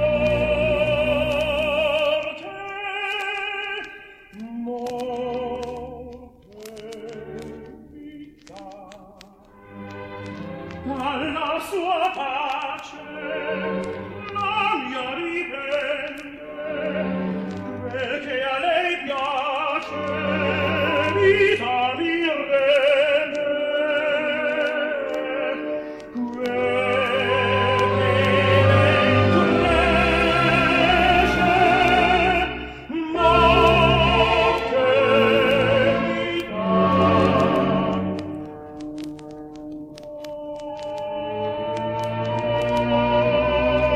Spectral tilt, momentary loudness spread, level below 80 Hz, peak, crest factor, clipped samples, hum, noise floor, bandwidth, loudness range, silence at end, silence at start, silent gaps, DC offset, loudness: -6 dB/octave; 19 LU; -40 dBFS; -4 dBFS; 18 dB; under 0.1%; none; -48 dBFS; 14.5 kHz; 15 LU; 0 s; 0 s; none; under 0.1%; -21 LUFS